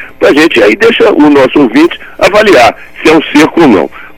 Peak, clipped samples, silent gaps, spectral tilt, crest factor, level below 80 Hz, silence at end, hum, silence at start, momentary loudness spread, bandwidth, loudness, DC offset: 0 dBFS; 9%; none; -4.5 dB/octave; 6 dB; -36 dBFS; 0.1 s; none; 0 s; 5 LU; 16 kHz; -5 LUFS; under 0.1%